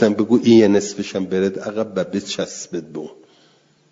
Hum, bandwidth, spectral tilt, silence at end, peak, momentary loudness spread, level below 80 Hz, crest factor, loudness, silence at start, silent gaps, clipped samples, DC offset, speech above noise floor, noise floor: none; 7.8 kHz; -5.5 dB/octave; 0.8 s; -2 dBFS; 16 LU; -60 dBFS; 18 dB; -19 LUFS; 0 s; none; under 0.1%; under 0.1%; 38 dB; -56 dBFS